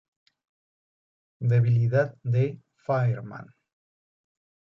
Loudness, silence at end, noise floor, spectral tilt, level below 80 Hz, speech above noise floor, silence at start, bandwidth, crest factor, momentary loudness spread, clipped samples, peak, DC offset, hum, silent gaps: -25 LUFS; 1.3 s; under -90 dBFS; -10 dB/octave; -64 dBFS; over 66 dB; 1.4 s; 5.8 kHz; 16 dB; 17 LU; under 0.1%; -12 dBFS; under 0.1%; none; none